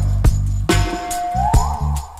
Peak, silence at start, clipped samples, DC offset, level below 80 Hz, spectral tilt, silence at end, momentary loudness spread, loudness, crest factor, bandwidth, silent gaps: -2 dBFS; 0 s; under 0.1%; under 0.1%; -20 dBFS; -5.5 dB/octave; 0 s; 5 LU; -19 LUFS; 16 dB; 15.5 kHz; none